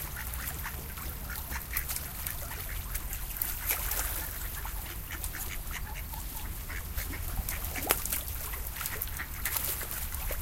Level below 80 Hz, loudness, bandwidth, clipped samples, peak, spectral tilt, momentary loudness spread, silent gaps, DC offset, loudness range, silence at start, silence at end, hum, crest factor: -40 dBFS; -34 LUFS; 17 kHz; under 0.1%; -4 dBFS; -2.5 dB/octave; 9 LU; none; under 0.1%; 4 LU; 0 s; 0 s; none; 32 dB